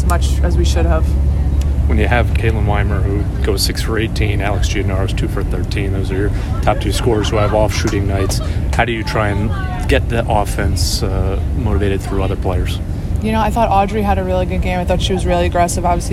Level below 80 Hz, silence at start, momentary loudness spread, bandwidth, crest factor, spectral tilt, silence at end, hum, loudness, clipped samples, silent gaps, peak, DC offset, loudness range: -20 dBFS; 0 s; 4 LU; 14 kHz; 14 dB; -6 dB/octave; 0 s; none; -16 LUFS; under 0.1%; none; 0 dBFS; under 0.1%; 2 LU